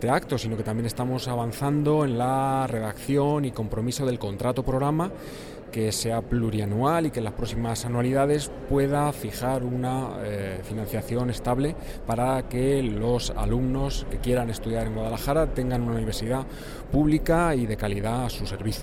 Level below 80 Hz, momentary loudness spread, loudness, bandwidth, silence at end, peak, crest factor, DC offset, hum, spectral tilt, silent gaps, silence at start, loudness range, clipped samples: -36 dBFS; 8 LU; -26 LUFS; 18.5 kHz; 0 s; -10 dBFS; 16 dB; under 0.1%; none; -6 dB/octave; none; 0 s; 2 LU; under 0.1%